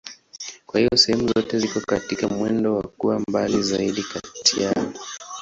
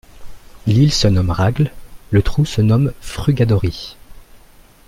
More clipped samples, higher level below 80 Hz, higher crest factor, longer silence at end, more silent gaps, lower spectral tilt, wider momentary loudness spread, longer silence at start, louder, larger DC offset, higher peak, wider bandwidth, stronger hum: neither; second, -52 dBFS vs -32 dBFS; about the same, 20 dB vs 16 dB; second, 0 s vs 0.5 s; neither; second, -3.5 dB/octave vs -6.5 dB/octave; first, 16 LU vs 9 LU; about the same, 0.05 s vs 0.15 s; second, -21 LUFS vs -16 LUFS; neither; about the same, -2 dBFS vs -2 dBFS; second, 8 kHz vs 15 kHz; neither